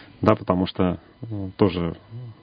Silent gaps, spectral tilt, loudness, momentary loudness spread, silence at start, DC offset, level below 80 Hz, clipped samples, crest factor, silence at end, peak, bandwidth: none; -9.5 dB/octave; -24 LUFS; 14 LU; 0 s; under 0.1%; -44 dBFS; under 0.1%; 24 dB; 0.1 s; 0 dBFS; 6.4 kHz